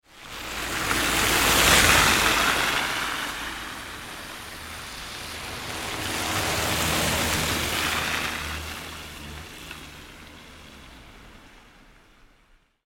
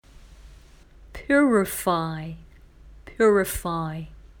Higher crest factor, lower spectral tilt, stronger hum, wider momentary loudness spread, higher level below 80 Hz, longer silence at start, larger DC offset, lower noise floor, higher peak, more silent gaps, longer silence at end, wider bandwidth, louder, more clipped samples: first, 24 dB vs 18 dB; second, -2 dB/octave vs -5.5 dB/octave; neither; about the same, 22 LU vs 24 LU; about the same, -42 dBFS vs -46 dBFS; about the same, 0.15 s vs 0.2 s; neither; first, -60 dBFS vs -50 dBFS; first, -2 dBFS vs -8 dBFS; neither; first, 1.25 s vs 0.25 s; second, 17.5 kHz vs 19.5 kHz; about the same, -22 LUFS vs -23 LUFS; neither